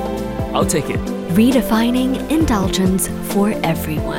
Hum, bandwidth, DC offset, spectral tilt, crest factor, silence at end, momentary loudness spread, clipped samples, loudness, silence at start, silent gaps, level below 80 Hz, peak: none; 17.5 kHz; under 0.1%; -5.5 dB/octave; 14 dB; 0 s; 7 LU; under 0.1%; -17 LUFS; 0 s; none; -32 dBFS; -2 dBFS